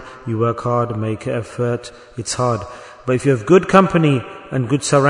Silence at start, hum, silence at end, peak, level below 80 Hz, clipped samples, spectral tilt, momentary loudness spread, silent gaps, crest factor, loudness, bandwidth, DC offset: 0 s; none; 0 s; 0 dBFS; -50 dBFS; under 0.1%; -6 dB/octave; 14 LU; none; 18 dB; -18 LUFS; 11 kHz; under 0.1%